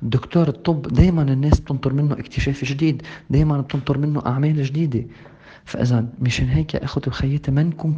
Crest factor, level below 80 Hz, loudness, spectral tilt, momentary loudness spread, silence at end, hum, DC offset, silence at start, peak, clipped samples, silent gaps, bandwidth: 20 dB; -32 dBFS; -20 LUFS; -7.5 dB/octave; 7 LU; 0 s; none; under 0.1%; 0 s; 0 dBFS; under 0.1%; none; 7.6 kHz